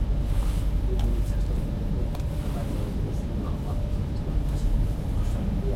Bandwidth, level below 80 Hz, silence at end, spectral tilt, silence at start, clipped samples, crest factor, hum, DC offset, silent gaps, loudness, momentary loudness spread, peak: 13.5 kHz; -26 dBFS; 0 s; -7.5 dB/octave; 0 s; under 0.1%; 12 dB; none; under 0.1%; none; -29 LUFS; 3 LU; -14 dBFS